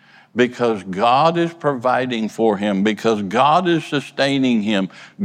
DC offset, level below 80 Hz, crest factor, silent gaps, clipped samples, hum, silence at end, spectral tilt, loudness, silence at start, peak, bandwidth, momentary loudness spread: under 0.1%; -68 dBFS; 16 dB; none; under 0.1%; none; 0 s; -6 dB/octave; -18 LUFS; 0.35 s; -2 dBFS; 13 kHz; 7 LU